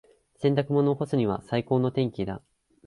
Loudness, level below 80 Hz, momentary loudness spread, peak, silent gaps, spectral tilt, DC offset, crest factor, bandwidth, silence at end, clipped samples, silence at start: -26 LUFS; -56 dBFS; 9 LU; -10 dBFS; none; -8.5 dB/octave; under 0.1%; 16 dB; 11.5 kHz; 0.5 s; under 0.1%; 0.4 s